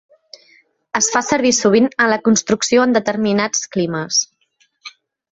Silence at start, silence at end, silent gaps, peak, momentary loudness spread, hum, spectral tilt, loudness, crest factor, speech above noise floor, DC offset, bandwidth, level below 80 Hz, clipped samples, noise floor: 0.95 s; 0.45 s; none; 0 dBFS; 6 LU; none; -3 dB/octave; -16 LUFS; 16 dB; 46 dB; under 0.1%; 8.2 kHz; -58 dBFS; under 0.1%; -61 dBFS